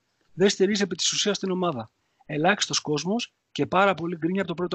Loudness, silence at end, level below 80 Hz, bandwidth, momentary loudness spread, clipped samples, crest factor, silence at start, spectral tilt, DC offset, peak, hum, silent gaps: -25 LUFS; 0 s; -66 dBFS; 9 kHz; 9 LU; under 0.1%; 20 dB; 0.35 s; -3.5 dB/octave; under 0.1%; -6 dBFS; none; none